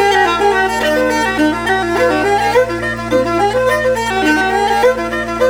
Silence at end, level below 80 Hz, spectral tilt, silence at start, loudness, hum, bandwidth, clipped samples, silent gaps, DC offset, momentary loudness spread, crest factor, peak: 0 s; -36 dBFS; -4 dB/octave; 0 s; -14 LUFS; none; 18.5 kHz; under 0.1%; none; under 0.1%; 4 LU; 12 dB; -2 dBFS